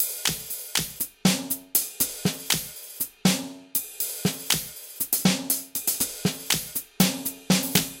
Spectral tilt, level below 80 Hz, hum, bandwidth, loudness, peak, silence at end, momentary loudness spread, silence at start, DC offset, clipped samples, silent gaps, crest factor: -3 dB/octave; -56 dBFS; none; 17 kHz; -25 LUFS; -4 dBFS; 0 s; 8 LU; 0 s; under 0.1%; under 0.1%; none; 24 dB